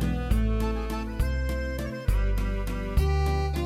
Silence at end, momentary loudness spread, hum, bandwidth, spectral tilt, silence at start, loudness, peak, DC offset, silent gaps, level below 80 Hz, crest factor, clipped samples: 0 s; 5 LU; none; 15 kHz; -7 dB/octave; 0 s; -29 LUFS; -12 dBFS; under 0.1%; none; -28 dBFS; 14 dB; under 0.1%